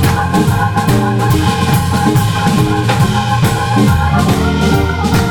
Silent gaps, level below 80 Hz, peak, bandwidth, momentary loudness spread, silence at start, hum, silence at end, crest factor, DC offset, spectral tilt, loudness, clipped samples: none; -26 dBFS; -2 dBFS; 20 kHz; 1 LU; 0 s; none; 0 s; 10 dB; under 0.1%; -6 dB/octave; -12 LUFS; under 0.1%